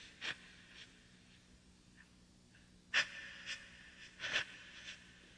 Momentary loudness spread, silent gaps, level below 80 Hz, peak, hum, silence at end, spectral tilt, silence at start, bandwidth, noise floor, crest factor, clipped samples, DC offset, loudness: 27 LU; none; -72 dBFS; -22 dBFS; none; 0 s; -0.5 dB/octave; 0 s; 10.5 kHz; -65 dBFS; 26 dB; under 0.1%; under 0.1%; -41 LUFS